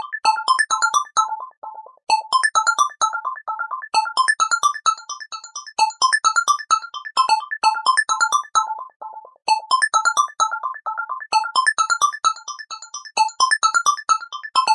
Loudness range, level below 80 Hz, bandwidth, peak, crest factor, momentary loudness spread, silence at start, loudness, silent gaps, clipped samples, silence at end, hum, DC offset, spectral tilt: 2 LU; -78 dBFS; 11.5 kHz; -4 dBFS; 16 dB; 14 LU; 0 s; -19 LUFS; 1.57-1.62 s, 8.96-9.00 s; under 0.1%; 0 s; none; under 0.1%; 3.5 dB/octave